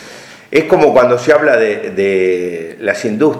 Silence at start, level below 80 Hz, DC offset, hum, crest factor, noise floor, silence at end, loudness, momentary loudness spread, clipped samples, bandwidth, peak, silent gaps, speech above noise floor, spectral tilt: 0 s; -52 dBFS; under 0.1%; none; 12 dB; -35 dBFS; 0 s; -12 LUFS; 9 LU; 0.2%; 12.5 kHz; 0 dBFS; none; 23 dB; -5.5 dB/octave